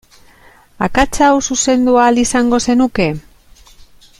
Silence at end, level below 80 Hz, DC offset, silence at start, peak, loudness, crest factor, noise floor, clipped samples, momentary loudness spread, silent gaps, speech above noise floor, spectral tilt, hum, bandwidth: 1 s; -34 dBFS; under 0.1%; 0.8 s; 0 dBFS; -13 LUFS; 14 dB; -45 dBFS; under 0.1%; 7 LU; none; 33 dB; -4 dB/octave; none; 13 kHz